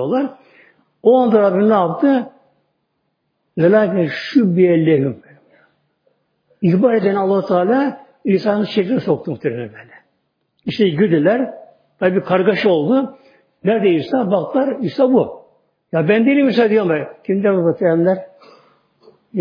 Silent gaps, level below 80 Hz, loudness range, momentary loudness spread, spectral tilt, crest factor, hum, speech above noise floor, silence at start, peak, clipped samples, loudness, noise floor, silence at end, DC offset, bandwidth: none; -64 dBFS; 3 LU; 10 LU; -9 dB/octave; 16 dB; none; 55 dB; 0 s; 0 dBFS; under 0.1%; -16 LUFS; -69 dBFS; 0 s; under 0.1%; 5.2 kHz